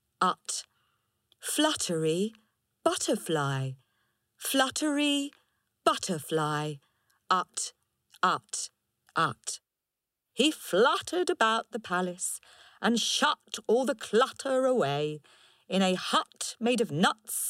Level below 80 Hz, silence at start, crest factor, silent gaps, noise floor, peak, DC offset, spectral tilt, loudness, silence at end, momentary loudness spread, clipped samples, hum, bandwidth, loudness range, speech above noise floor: -76 dBFS; 0.2 s; 20 dB; none; -88 dBFS; -10 dBFS; under 0.1%; -3.5 dB/octave; -29 LUFS; 0 s; 10 LU; under 0.1%; none; 16 kHz; 4 LU; 59 dB